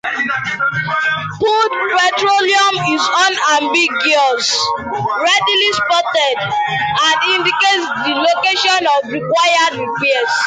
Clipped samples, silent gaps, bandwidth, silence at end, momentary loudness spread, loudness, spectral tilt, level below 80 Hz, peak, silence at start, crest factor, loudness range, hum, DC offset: under 0.1%; none; 9.6 kHz; 0 s; 5 LU; -13 LUFS; -2 dB/octave; -56 dBFS; -2 dBFS; 0.05 s; 12 dB; 1 LU; none; under 0.1%